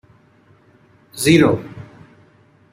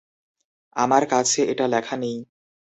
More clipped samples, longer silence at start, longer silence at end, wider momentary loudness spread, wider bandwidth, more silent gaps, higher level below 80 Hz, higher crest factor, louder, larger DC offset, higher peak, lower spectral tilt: neither; first, 1.15 s vs 0.75 s; first, 0.9 s vs 0.5 s; first, 25 LU vs 13 LU; first, 16 kHz vs 8.4 kHz; neither; first, -54 dBFS vs -66 dBFS; about the same, 20 dB vs 20 dB; first, -15 LUFS vs -21 LUFS; neither; about the same, -2 dBFS vs -4 dBFS; first, -5.5 dB/octave vs -3 dB/octave